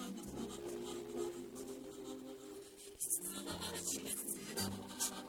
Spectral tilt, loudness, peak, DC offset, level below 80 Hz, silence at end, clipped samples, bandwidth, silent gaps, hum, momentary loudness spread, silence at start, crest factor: -2.5 dB/octave; -43 LUFS; -22 dBFS; under 0.1%; -68 dBFS; 0 s; under 0.1%; 18 kHz; none; none; 12 LU; 0 s; 22 dB